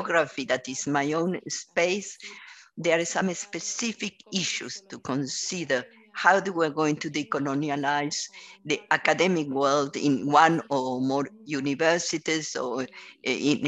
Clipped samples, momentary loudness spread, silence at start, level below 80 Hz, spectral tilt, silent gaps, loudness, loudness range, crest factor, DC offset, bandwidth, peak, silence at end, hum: under 0.1%; 12 LU; 0 s; -72 dBFS; -3.5 dB/octave; none; -26 LUFS; 5 LU; 22 dB; under 0.1%; 9.8 kHz; -4 dBFS; 0 s; none